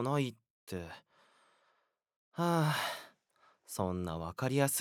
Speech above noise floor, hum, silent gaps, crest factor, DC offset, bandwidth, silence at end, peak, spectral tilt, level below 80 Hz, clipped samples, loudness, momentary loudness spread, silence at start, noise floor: 44 dB; none; 0.50-0.67 s, 2.16-2.32 s; 22 dB; under 0.1%; 19 kHz; 0 s; -16 dBFS; -5 dB/octave; -70 dBFS; under 0.1%; -36 LUFS; 16 LU; 0 s; -78 dBFS